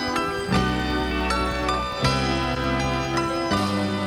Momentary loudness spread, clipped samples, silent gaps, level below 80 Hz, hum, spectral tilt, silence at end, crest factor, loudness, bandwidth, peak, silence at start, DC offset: 2 LU; under 0.1%; none; -34 dBFS; none; -5 dB/octave; 0 s; 16 dB; -23 LUFS; 18 kHz; -8 dBFS; 0 s; under 0.1%